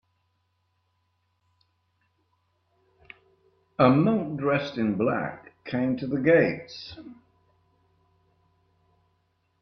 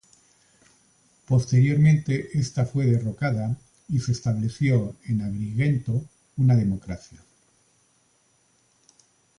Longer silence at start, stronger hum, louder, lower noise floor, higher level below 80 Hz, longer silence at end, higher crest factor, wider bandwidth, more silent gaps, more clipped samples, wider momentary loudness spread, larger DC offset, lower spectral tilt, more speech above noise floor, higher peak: first, 3.8 s vs 1.3 s; neither; about the same, -25 LUFS vs -24 LUFS; first, -73 dBFS vs -65 dBFS; second, -66 dBFS vs -52 dBFS; about the same, 2.5 s vs 2.4 s; first, 24 dB vs 16 dB; second, 6.4 kHz vs 10.5 kHz; neither; neither; first, 20 LU vs 11 LU; neither; about the same, -8.5 dB/octave vs -7.5 dB/octave; first, 49 dB vs 42 dB; first, -6 dBFS vs -10 dBFS